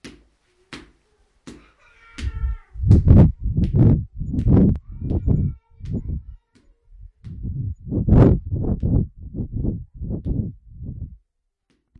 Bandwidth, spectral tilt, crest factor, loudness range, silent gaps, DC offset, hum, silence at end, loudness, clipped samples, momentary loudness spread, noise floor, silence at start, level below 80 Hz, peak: 6.8 kHz; -10.5 dB/octave; 20 dB; 9 LU; none; under 0.1%; none; 0.85 s; -20 LUFS; under 0.1%; 23 LU; -71 dBFS; 0.05 s; -28 dBFS; 0 dBFS